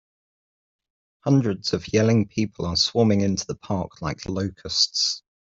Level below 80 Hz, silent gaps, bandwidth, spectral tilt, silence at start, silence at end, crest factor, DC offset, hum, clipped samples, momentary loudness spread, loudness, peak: -54 dBFS; none; 7.8 kHz; -5 dB/octave; 1.25 s; 0.25 s; 18 dB; under 0.1%; none; under 0.1%; 10 LU; -23 LUFS; -6 dBFS